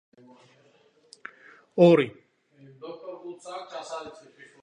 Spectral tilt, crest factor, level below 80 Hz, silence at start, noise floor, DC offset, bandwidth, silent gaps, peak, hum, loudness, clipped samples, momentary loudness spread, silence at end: -7 dB/octave; 24 dB; -74 dBFS; 1.75 s; -62 dBFS; under 0.1%; 10 kHz; none; -6 dBFS; none; -23 LUFS; under 0.1%; 27 LU; 0.5 s